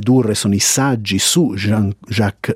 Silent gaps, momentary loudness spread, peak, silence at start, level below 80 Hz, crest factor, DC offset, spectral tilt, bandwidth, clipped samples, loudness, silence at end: none; 6 LU; -2 dBFS; 0 s; -54 dBFS; 14 dB; under 0.1%; -4 dB/octave; 16 kHz; under 0.1%; -15 LUFS; 0 s